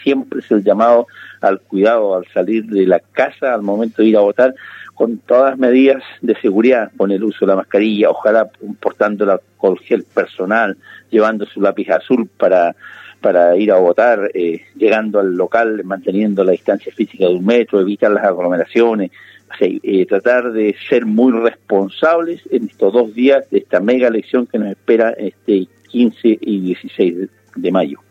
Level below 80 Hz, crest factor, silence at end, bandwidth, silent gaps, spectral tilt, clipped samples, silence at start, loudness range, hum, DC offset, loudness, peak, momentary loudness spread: -72 dBFS; 14 dB; 0.15 s; 7.4 kHz; none; -7.5 dB/octave; under 0.1%; 0 s; 2 LU; none; under 0.1%; -14 LUFS; 0 dBFS; 8 LU